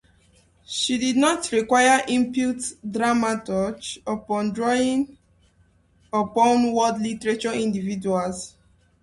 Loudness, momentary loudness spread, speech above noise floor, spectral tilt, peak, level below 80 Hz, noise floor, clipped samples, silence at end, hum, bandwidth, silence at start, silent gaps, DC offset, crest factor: -22 LUFS; 11 LU; 38 dB; -4 dB/octave; -6 dBFS; -58 dBFS; -60 dBFS; under 0.1%; 0.55 s; none; 11.5 kHz; 0.7 s; none; under 0.1%; 18 dB